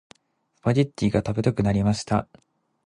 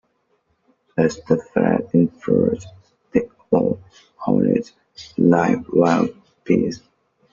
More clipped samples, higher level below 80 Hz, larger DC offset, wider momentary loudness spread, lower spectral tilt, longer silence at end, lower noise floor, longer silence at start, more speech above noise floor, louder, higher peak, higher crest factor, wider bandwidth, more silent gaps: neither; first, -46 dBFS vs -54 dBFS; neither; second, 4 LU vs 13 LU; about the same, -7 dB/octave vs -7.5 dB/octave; about the same, 0.65 s vs 0.55 s; first, -70 dBFS vs -66 dBFS; second, 0.65 s vs 0.95 s; about the same, 47 dB vs 48 dB; second, -24 LUFS vs -20 LUFS; second, -6 dBFS vs -2 dBFS; about the same, 18 dB vs 18 dB; first, 11 kHz vs 7.4 kHz; neither